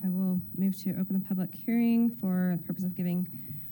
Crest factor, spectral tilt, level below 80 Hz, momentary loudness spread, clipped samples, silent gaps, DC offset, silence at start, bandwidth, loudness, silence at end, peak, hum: 10 dB; -8.5 dB/octave; -68 dBFS; 7 LU; under 0.1%; none; under 0.1%; 0 s; 17 kHz; -30 LUFS; 0 s; -18 dBFS; none